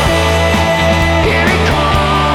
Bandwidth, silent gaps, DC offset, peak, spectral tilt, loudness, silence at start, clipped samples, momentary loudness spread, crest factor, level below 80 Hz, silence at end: 16 kHz; none; under 0.1%; 0 dBFS; -5 dB/octave; -11 LUFS; 0 s; under 0.1%; 1 LU; 10 dB; -20 dBFS; 0 s